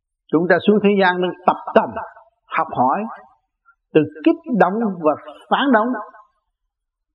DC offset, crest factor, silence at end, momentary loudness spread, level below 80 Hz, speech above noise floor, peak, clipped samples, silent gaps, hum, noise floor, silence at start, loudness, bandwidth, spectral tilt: under 0.1%; 20 dB; 1.05 s; 13 LU; -66 dBFS; 60 dB; 0 dBFS; under 0.1%; none; none; -77 dBFS; 0.3 s; -18 LUFS; 5.4 kHz; -9 dB/octave